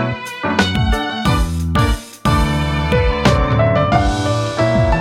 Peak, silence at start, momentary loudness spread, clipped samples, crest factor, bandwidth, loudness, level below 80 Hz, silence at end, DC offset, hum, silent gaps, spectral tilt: 0 dBFS; 0 s; 4 LU; under 0.1%; 14 dB; 16 kHz; -16 LUFS; -22 dBFS; 0 s; under 0.1%; none; none; -6 dB/octave